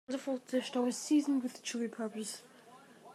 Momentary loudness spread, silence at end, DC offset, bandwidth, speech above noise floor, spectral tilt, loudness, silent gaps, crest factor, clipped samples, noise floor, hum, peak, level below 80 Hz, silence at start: 11 LU; 0 s; under 0.1%; 14 kHz; 23 dB; -3.5 dB/octave; -35 LUFS; none; 16 dB; under 0.1%; -58 dBFS; none; -20 dBFS; under -90 dBFS; 0.1 s